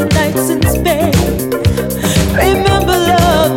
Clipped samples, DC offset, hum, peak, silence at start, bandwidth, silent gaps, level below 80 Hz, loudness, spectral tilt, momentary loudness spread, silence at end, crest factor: under 0.1%; under 0.1%; none; 0 dBFS; 0 s; 17 kHz; none; -22 dBFS; -12 LUFS; -5 dB/octave; 5 LU; 0 s; 12 dB